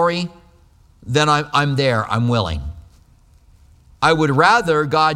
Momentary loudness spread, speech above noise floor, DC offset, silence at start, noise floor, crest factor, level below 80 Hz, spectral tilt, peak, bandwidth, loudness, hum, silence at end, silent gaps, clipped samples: 12 LU; 34 dB; under 0.1%; 0 s; -51 dBFS; 18 dB; -40 dBFS; -5.5 dB/octave; 0 dBFS; 13.5 kHz; -17 LUFS; none; 0 s; none; under 0.1%